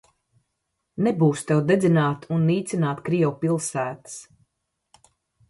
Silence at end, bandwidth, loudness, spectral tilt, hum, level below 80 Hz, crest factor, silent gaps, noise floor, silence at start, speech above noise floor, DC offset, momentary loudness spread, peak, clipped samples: 1.3 s; 11.5 kHz; -23 LUFS; -6.5 dB/octave; none; -64 dBFS; 18 dB; none; -78 dBFS; 0.95 s; 56 dB; under 0.1%; 15 LU; -6 dBFS; under 0.1%